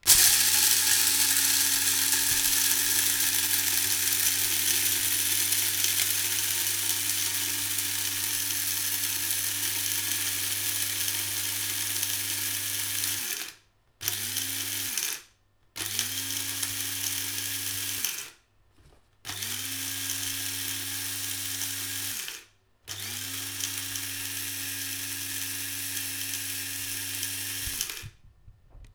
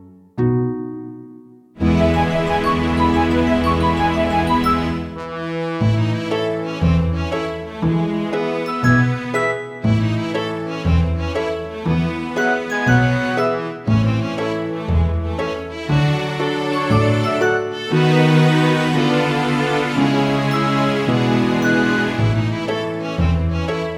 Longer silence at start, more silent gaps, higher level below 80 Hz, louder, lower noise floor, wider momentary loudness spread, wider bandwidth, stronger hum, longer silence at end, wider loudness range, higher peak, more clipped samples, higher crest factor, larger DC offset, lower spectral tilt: about the same, 0.05 s vs 0 s; neither; second, -60 dBFS vs -32 dBFS; second, -25 LUFS vs -18 LUFS; first, -64 dBFS vs -42 dBFS; first, 11 LU vs 8 LU; first, over 20 kHz vs 13.5 kHz; neither; about the same, 0.05 s vs 0 s; first, 10 LU vs 4 LU; about the same, -2 dBFS vs -2 dBFS; neither; first, 28 dB vs 16 dB; neither; second, 0.5 dB/octave vs -7 dB/octave